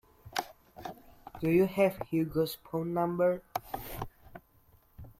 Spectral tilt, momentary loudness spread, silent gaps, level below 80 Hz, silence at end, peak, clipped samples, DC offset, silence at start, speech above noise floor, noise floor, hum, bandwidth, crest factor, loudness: -6.5 dB/octave; 19 LU; none; -58 dBFS; 0.1 s; -16 dBFS; under 0.1%; under 0.1%; 0.25 s; 34 dB; -64 dBFS; none; 16.5 kHz; 18 dB; -32 LUFS